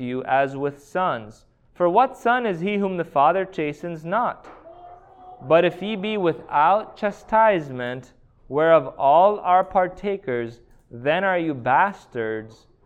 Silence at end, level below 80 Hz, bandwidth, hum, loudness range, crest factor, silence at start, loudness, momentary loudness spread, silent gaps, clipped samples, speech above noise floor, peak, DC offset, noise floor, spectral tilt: 0.35 s; -56 dBFS; 8.8 kHz; none; 4 LU; 18 dB; 0 s; -21 LUFS; 12 LU; none; under 0.1%; 24 dB; -4 dBFS; under 0.1%; -45 dBFS; -7 dB/octave